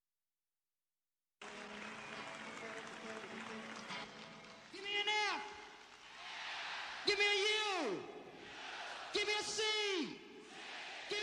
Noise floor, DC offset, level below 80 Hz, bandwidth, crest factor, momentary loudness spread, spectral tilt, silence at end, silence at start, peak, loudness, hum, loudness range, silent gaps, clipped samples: under -90 dBFS; under 0.1%; -80 dBFS; 13 kHz; 22 dB; 19 LU; -1 dB/octave; 0 s; 1.4 s; -20 dBFS; -40 LUFS; none; 12 LU; none; under 0.1%